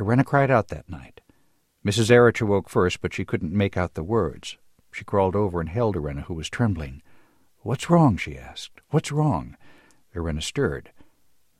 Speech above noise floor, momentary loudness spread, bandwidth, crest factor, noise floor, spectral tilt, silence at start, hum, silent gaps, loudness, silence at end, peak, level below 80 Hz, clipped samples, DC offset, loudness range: 43 dB; 19 LU; 13.5 kHz; 20 dB; -66 dBFS; -6.5 dB/octave; 0 s; none; none; -23 LUFS; 0.6 s; -4 dBFS; -44 dBFS; under 0.1%; under 0.1%; 5 LU